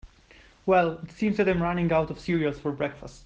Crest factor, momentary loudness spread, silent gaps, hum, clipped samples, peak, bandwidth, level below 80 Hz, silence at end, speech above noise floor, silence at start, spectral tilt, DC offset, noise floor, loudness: 16 dB; 8 LU; none; none; under 0.1%; -10 dBFS; 8.2 kHz; -50 dBFS; 0.05 s; 29 dB; 0.05 s; -7.5 dB/octave; under 0.1%; -55 dBFS; -26 LUFS